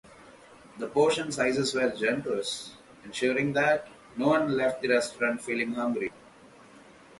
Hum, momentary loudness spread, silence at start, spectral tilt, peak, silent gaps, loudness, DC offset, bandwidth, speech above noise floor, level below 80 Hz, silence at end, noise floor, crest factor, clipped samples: none; 12 LU; 0.2 s; -4.5 dB/octave; -12 dBFS; none; -28 LUFS; under 0.1%; 11.5 kHz; 26 dB; -66 dBFS; 0.75 s; -53 dBFS; 18 dB; under 0.1%